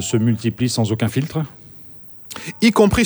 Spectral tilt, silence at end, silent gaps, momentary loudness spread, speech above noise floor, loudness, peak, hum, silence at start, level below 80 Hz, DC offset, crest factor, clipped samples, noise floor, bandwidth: -5.5 dB/octave; 0 s; none; 21 LU; 23 dB; -19 LUFS; 0 dBFS; none; 0 s; -42 dBFS; under 0.1%; 18 dB; under 0.1%; -40 dBFS; over 20 kHz